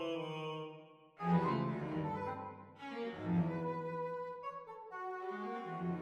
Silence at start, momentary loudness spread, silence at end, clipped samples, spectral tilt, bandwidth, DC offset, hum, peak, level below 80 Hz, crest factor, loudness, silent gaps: 0 s; 13 LU; 0 s; under 0.1%; -8.5 dB/octave; 6.8 kHz; under 0.1%; none; -22 dBFS; -72 dBFS; 18 dB; -40 LUFS; none